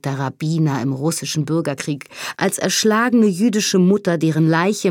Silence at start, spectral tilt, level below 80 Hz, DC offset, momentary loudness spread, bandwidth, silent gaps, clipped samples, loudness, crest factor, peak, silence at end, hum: 0.05 s; -5 dB/octave; -66 dBFS; under 0.1%; 9 LU; 17.5 kHz; none; under 0.1%; -18 LUFS; 16 dB; -2 dBFS; 0 s; none